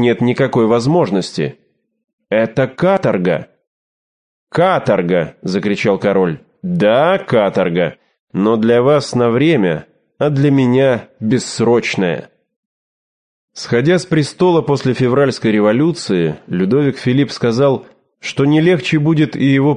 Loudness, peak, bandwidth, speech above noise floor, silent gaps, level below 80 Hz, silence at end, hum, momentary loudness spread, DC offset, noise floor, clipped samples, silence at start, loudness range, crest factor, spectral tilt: -14 LUFS; 0 dBFS; 10 kHz; over 76 dB; 2.04-2.18 s, 3.67-4.47 s, 8.20-8.27 s, 12.56-13.48 s; -52 dBFS; 0 s; none; 7 LU; under 0.1%; under -90 dBFS; under 0.1%; 0 s; 3 LU; 14 dB; -6.5 dB/octave